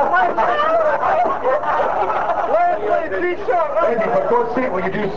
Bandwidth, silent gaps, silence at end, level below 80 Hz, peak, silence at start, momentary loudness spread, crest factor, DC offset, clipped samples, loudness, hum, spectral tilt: 7.6 kHz; none; 0 s; -48 dBFS; -6 dBFS; 0 s; 4 LU; 12 dB; 4%; under 0.1%; -18 LUFS; none; -6.5 dB/octave